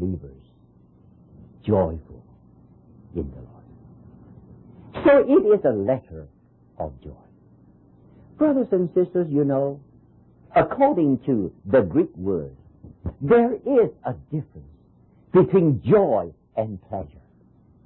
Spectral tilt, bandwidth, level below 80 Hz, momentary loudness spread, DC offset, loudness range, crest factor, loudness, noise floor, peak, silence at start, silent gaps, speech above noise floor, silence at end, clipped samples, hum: -12.5 dB/octave; 4.2 kHz; -48 dBFS; 19 LU; under 0.1%; 9 LU; 16 dB; -21 LUFS; -55 dBFS; -6 dBFS; 0 s; none; 35 dB; 0.8 s; under 0.1%; none